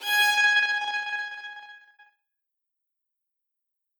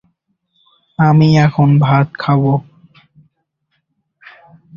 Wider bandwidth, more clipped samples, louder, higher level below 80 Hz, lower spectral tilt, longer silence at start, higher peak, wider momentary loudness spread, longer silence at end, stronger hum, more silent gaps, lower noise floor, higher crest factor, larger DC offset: first, over 20 kHz vs 7 kHz; neither; second, -22 LUFS vs -12 LUFS; second, -80 dBFS vs -50 dBFS; second, 4 dB/octave vs -8.5 dB/octave; second, 0 s vs 1 s; second, -12 dBFS vs -2 dBFS; first, 20 LU vs 8 LU; about the same, 2.2 s vs 2.15 s; neither; neither; first, -83 dBFS vs -68 dBFS; about the same, 18 dB vs 14 dB; neither